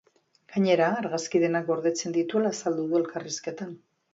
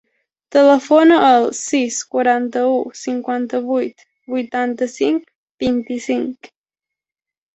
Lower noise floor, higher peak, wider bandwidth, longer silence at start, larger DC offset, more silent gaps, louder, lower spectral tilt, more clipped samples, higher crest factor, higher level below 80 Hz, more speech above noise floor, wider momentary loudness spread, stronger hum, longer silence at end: second, -59 dBFS vs -87 dBFS; second, -10 dBFS vs -2 dBFS; about the same, 8 kHz vs 8.2 kHz; about the same, 0.5 s vs 0.5 s; neither; second, none vs 5.35-5.58 s; second, -27 LUFS vs -17 LUFS; first, -5 dB/octave vs -3.5 dB/octave; neither; about the same, 18 dB vs 16 dB; second, -74 dBFS vs -58 dBFS; second, 33 dB vs 71 dB; about the same, 10 LU vs 12 LU; neither; second, 0.35 s vs 1.1 s